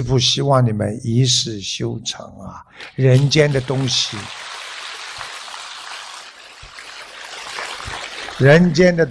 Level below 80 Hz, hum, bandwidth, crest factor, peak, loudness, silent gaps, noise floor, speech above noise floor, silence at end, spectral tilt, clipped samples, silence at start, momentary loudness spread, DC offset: -46 dBFS; none; 11 kHz; 16 dB; -2 dBFS; -17 LUFS; none; -39 dBFS; 23 dB; 0 s; -5 dB/octave; under 0.1%; 0 s; 21 LU; under 0.1%